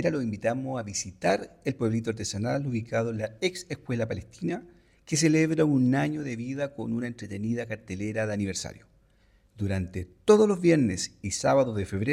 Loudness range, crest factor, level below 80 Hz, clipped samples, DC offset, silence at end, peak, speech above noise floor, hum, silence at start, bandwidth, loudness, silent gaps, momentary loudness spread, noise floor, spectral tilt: 7 LU; 20 dB; -58 dBFS; under 0.1%; under 0.1%; 0 s; -8 dBFS; 35 dB; none; 0 s; 14.5 kHz; -28 LUFS; none; 11 LU; -62 dBFS; -5.5 dB/octave